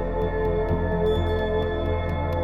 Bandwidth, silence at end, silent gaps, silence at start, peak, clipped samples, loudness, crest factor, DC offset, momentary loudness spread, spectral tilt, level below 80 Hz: 5.6 kHz; 0 s; none; 0 s; -12 dBFS; under 0.1%; -25 LUFS; 12 dB; 0.7%; 3 LU; -8.5 dB/octave; -30 dBFS